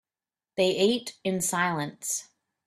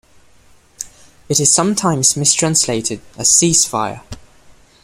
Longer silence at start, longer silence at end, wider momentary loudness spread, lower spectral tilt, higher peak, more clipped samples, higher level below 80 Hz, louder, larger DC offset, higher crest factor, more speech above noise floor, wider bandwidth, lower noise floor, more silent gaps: second, 0.55 s vs 0.8 s; second, 0.45 s vs 0.65 s; second, 8 LU vs 20 LU; about the same, -3.5 dB/octave vs -2.5 dB/octave; second, -10 dBFS vs 0 dBFS; neither; second, -68 dBFS vs -48 dBFS; second, -27 LUFS vs -13 LUFS; neither; about the same, 18 dB vs 18 dB; first, over 63 dB vs 33 dB; about the same, 15 kHz vs 16 kHz; first, under -90 dBFS vs -48 dBFS; neither